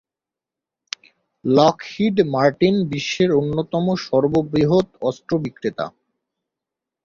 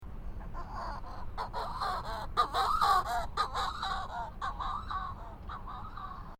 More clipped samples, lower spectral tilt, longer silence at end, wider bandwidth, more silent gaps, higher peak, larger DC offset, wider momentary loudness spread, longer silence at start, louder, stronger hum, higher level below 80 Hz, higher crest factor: neither; first, -6.5 dB/octave vs -4 dB/octave; first, 1.15 s vs 0.05 s; second, 7.4 kHz vs 17 kHz; neither; first, -2 dBFS vs -16 dBFS; neither; about the same, 14 LU vs 16 LU; first, 1.45 s vs 0 s; first, -19 LUFS vs -35 LUFS; neither; second, -54 dBFS vs -44 dBFS; about the same, 20 dB vs 20 dB